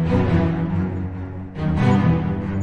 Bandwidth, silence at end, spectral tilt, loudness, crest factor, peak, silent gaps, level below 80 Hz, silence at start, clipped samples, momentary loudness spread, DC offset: 7.2 kHz; 0 s; -9 dB/octave; -21 LUFS; 16 dB; -4 dBFS; none; -38 dBFS; 0 s; under 0.1%; 12 LU; under 0.1%